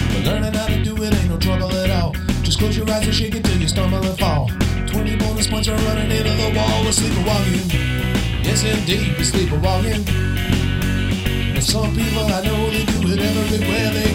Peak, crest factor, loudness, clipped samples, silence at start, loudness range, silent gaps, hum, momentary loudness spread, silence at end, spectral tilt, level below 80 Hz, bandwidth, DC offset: -2 dBFS; 14 dB; -18 LUFS; under 0.1%; 0 s; 1 LU; none; none; 3 LU; 0 s; -5 dB/octave; -26 dBFS; 16.5 kHz; under 0.1%